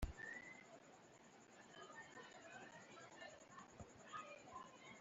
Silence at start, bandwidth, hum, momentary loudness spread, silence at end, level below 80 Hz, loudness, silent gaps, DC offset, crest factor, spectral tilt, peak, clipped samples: 0 s; 8 kHz; none; 11 LU; 0 s; -62 dBFS; -58 LUFS; none; under 0.1%; 28 dB; -3.5 dB/octave; -30 dBFS; under 0.1%